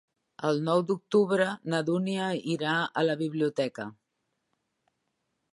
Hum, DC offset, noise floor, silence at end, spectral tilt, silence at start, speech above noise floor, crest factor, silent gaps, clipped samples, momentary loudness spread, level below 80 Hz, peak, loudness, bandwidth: none; under 0.1%; -80 dBFS; 1.6 s; -6 dB/octave; 0.4 s; 52 dB; 18 dB; none; under 0.1%; 7 LU; -78 dBFS; -12 dBFS; -28 LUFS; 11.5 kHz